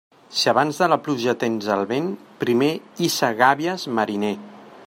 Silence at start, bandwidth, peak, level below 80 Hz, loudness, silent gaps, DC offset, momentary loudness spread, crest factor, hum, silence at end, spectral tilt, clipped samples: 0.3 s; 16.5 kHz; -2 dBFS; -68 dBFS; -21 LUFS; none; under 0.1%; 9 LU; 20 dB; none; 0.05 s; -4.5 dB/octave; under 0.1%